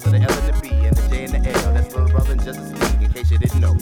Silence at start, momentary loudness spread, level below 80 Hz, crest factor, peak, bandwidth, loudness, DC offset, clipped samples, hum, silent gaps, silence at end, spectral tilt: 0 s; 5 LU; -18 dBFS; 12 dB; -4 dBFS; 17 kHz; -19 LUFS; under 0.1%; under 0.1%; none; none; 0 s; -6 dB/octave